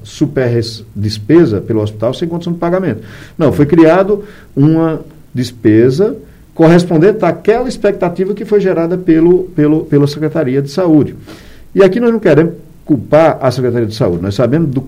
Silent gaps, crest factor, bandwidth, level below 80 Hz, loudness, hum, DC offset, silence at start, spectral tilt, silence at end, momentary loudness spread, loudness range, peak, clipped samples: none; 12 dB; 15 kHz; -40 dBFS; -12 LUFS; none; under 0.1%; 0.05 s; -8 dB/octave; 0 s; 11 LU; 1 LU; 0 dBFS; 0.5%